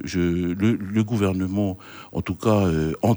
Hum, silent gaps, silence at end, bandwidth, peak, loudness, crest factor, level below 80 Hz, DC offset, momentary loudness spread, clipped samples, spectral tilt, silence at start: none; none; 0 s; over 20 kHz; -8 dBFS; -23 LUFS; 16 dB; -44 dBFS; under 0.1%; 9 LU; under 0.1%; -7.5 dB/octave; 0 s